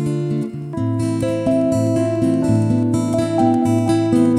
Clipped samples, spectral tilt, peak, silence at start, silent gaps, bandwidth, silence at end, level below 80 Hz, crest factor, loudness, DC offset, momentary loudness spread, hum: under 0.1%; -8 dB/octave; -2 dBFS; 0 s; none; 13 kHz; 0 s; -48 dBFS; 14 dB; -18 LUFS; under 0.1%; 6 LU; none